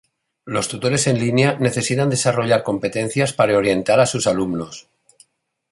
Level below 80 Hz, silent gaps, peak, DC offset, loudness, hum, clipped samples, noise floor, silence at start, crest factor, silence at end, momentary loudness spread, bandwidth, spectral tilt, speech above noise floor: -54 dBFS; none; -2 dBFS; under 0.1%; -18 LUFS; none; under 0.1%; -61 dBFS; 0.45 s; 16 dB; 0.9 s; 8 LU; 11.5 kHz; -4.5 dB/octave; 43 dB